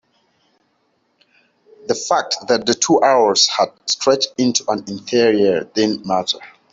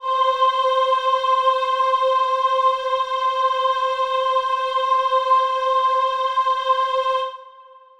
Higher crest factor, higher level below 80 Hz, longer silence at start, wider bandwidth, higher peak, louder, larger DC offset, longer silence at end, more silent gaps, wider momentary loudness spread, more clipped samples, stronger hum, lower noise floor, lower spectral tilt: first, 18 dB vs 12 dB; about the same, -62 dBFS vs -66 dBFS; first, 1.85 s vs 0 s; second, 8 kHz vs 10 kHz; first, -2 dBFS vs -6 dBFS; about the same, -17 LUFS vs -19 LUFS; neither; second, 0.25 s vs 0.4 s; neither; first, 10 LU vs 3 LU; neither; neither; first, -65 dBFS vs -46 dBFS; first, -2.5 dB/octave vs 1 dB/octave